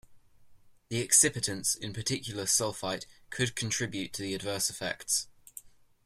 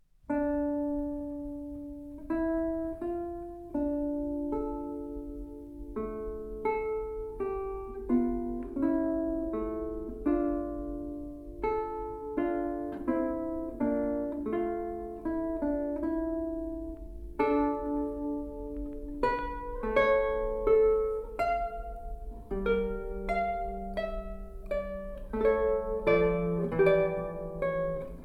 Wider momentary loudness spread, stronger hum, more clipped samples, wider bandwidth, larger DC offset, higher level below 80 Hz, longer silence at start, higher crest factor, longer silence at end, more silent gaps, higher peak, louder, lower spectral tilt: first, 17 LU vs 13 LU; neither; neither; first, 16 kHz vs 12 kHz; neither; second, -62 dBFS vs -44 dBFS; second, 0.1 s vs 0.3 s; first, 26 dB vs 20 dB; first, 0.4 s vs 0 s; neither; first, -8 dBFS vs -12 dBFS; first, -29 LUFS vs -32 LUFS; second, -2 dB/octave vs -8.5 dB/octave